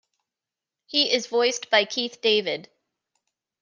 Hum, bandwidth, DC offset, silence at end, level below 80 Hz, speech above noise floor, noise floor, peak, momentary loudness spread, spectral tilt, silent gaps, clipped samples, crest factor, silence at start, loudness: none; 10 kHz; under 0.1%; 1 s; -80 dBFS; 66 dB; -89 dBFS; -6 dBFS; 6 LU; -1.5 dB/octave; none; under 0.1%; 20 dB; 0.9 s; -22 LUFS